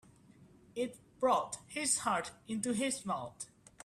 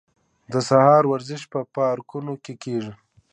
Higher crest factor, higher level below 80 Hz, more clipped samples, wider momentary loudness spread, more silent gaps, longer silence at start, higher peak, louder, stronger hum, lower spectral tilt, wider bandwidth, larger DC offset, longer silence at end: about the same, 20 dB vs 20 dB; about the same, -72 dBFS vs -68 dBFS; neither; second, 14 LU vs 17 LU; neither; about the same, 0.4 s vs 0.5 s; second, -18 dBFS vs -2 dBFS; second, -35 LUFS vs -21 LUFS; neither; second, -3 dB/octave vs -6.5 dB/octave; first, 15 kHz vs 9.8 kHz; neither; about the same, 0.4 s vs 0.4 s